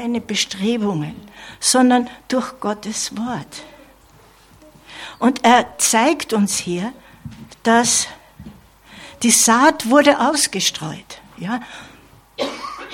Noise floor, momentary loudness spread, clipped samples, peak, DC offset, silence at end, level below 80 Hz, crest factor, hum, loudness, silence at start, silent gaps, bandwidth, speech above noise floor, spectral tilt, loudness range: -49 dBFS; 23 LU; under 0.1%; 0 dBFS; under 0.1%; 0 s; -54 dBFS; 20 dB; none; -17 LUFS; 0 s; none; 17 kHz; 31 dB; -2.5 dB/octave; 5 LU